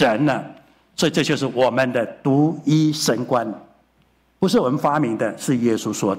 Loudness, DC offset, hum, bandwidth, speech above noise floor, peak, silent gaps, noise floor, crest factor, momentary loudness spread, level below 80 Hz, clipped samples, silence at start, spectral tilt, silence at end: -20 LUFS; under 0.1%; none; 16 kHz; 41 dB; -6 dBFS; none; -60 dBFS; 14 dB; 6 LU; -60 dBFS; under 0.1%; 0 s; -5.5 dB/octave; 0 s